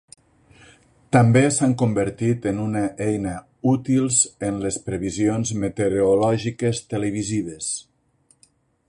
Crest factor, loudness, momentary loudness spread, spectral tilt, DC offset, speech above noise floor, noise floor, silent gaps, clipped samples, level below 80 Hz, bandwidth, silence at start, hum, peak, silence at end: 20 dB; -21 LUFS; 9 LU; -5.5 dB/octave; under 0.1%; 41 dB; -62 dBFS; none; under 0.1%; -50 dBFS; 11.5 kHz; 1.1 s; none; -2 dBFS; 1.05 s